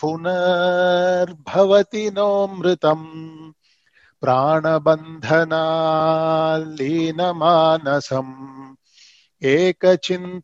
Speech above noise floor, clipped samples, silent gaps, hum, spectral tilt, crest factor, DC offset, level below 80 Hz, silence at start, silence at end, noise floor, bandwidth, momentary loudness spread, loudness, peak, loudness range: 41 dB; under 0.1%; none; none; -6 dB/octave; 16 dB; under 0.1%; -64 dBFS; 0 s; 0 s; -59 dBFS; 7.8 kHz; 10 LU; -18 LUFS; -2 dBFS; 2 LU